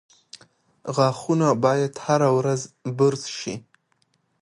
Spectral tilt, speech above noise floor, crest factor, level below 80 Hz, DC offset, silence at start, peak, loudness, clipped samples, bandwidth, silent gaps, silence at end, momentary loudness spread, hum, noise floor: -6 dB/octave; 46 dB; 18 dB; -68 dBFS; under 0.1%; 0.85 s; -6 dBFS; -22 LUFS; under 0.1%; 11.5 kHz; none; 0.85 s; 13 LU; none; -68 dBFS